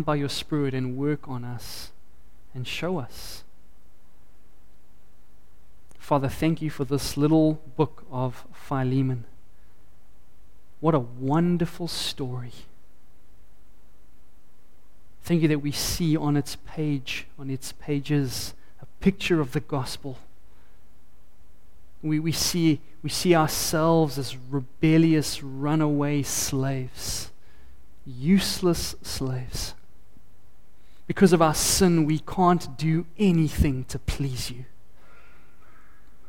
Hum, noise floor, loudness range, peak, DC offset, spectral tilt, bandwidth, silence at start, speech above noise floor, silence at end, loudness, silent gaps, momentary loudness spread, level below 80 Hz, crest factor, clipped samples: none; -57 dBFS; 10 LU; -6 dBFS; 2%; -5.5 dB/octave; 17 kHz; 0 s; 33 dB; 1.65 s; -25 LUFS; none; 14 LU; -44 dBFS; 22 dB; under 0.1%